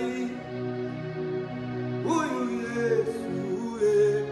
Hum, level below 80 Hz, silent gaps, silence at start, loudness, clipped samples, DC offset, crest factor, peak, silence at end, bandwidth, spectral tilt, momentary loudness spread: none; -62 dBFS; none; 0 s; -29 LUFS; under 0.1%; under 0.1%; 14 dB; -14 dBFS; 0 s; 12 kHz; -6.5 dB/octave; 10 LU